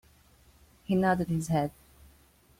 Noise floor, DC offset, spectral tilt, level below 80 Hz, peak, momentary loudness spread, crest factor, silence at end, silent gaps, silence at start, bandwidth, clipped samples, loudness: -61 dBFS; under 0.1%; -7 dB/octave; -56 dBFS; -12 dBFS; 10 LU; 20 dB; 0.9 s; none; 0.9 s; 16 kHz; under 0.1%; -29 LUFS